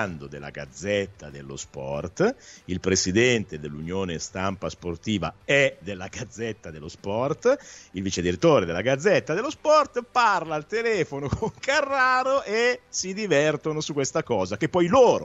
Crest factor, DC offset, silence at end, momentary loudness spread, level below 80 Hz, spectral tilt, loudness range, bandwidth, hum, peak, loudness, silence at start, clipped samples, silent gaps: 18 dB; under 0.1%; 0 s; 15 LU; -52 dBFS; -4.5 dB/octave; 5 LU; 8.2 kHz; none; -6 dBFS; -24 LUFS; 0 s; under 0.1%; none